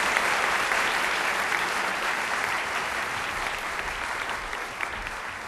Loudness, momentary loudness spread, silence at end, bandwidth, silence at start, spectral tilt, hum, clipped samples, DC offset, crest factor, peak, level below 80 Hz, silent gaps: -26 LUFS; 8 LU; 0 s; 13.5 kHz; 0 s; -1 dB/octave; none; under 0.1%; under 0.1%; 24 dB; -4 dBFS; -50 dBFS; none